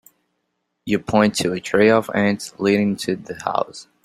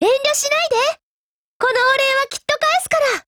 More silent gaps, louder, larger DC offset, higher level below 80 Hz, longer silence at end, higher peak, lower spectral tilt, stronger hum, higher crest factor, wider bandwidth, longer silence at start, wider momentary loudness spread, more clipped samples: second, none vs 1.03-1.60 s; second, -20 LUFS vs -17 LUFS; neither; about the same, -56 dBFS vs -58 dBFS; first, 0.25 s vs 0.05 s; about the same, -2 dBFS vs -2 dBFS; first, -5 dB/octave vs -0.5 dB/octave; neither; about the same, 18 dB vs 14 dB; second, 14.5 kHz vs over 20 kHz; first, 0.85 s vs 0 s; first, 10 LU vs 6 LU; neither